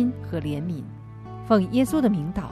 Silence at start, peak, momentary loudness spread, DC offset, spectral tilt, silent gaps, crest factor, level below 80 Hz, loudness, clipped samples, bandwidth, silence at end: 0 s; -6 dBFS; 18 LU; under 0.1%; -7.5 dB/octave; none; 18 dB; -46 dBFS; -24 LUFS; under 0.1%; 14 kHz; 0 s